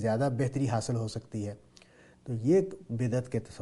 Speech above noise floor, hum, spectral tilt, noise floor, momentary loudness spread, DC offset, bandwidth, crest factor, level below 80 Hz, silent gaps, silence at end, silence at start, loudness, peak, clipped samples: 28 dB; none; -7 dB/octave; -58 dBFS; 13 LU; under 0.1%; 11.5 kHz; 16 dB; -60 dBFS; none; 0 s; 0 s; -31 LUFS; -14 dBFS; under 0.1%